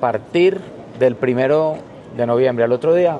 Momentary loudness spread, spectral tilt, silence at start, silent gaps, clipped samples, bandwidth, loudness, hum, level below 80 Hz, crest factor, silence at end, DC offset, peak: 14 LU; -7.5 dB/octave; 0 s; none; under 0.1%; 9.8 kHz; -17 LUFS; none; -60 dBFS; 14 dB; 0 s; under 0.1%; -2 dBFS